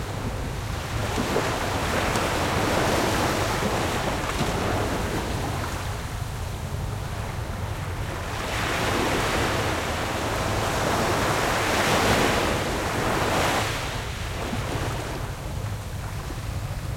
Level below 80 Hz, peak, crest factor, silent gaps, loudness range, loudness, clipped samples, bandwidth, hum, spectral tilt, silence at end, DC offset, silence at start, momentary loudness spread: -36 dBFS; -8 dBFS; 18 dB; none; 7 LU; -26 LUFS; under 0.1%; 16.5 kHz; none; -4.5 dB/octave; 0 s; under 0.1%; 0 s; 9 LU